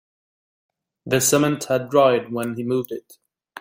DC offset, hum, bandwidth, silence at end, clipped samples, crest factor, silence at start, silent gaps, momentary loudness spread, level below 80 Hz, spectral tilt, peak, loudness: under 0.1%; none; 16.5 kHz; 0.6 s; under 0.1%; 18 dB; 1.05 s; none; 10 LU; -62 dBFS; -4 dB/octave; -4 dBFS; -20 LUFS